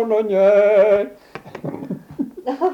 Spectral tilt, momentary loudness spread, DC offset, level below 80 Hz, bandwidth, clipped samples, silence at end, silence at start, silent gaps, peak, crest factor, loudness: -7.5 dB/octave; 18 LU; under 0.1%; -60 dBFS; 6.4 kHz; under 0.1%; 0 s; 0 s; none; -4 dBFS; 14 dB; -16 LUFS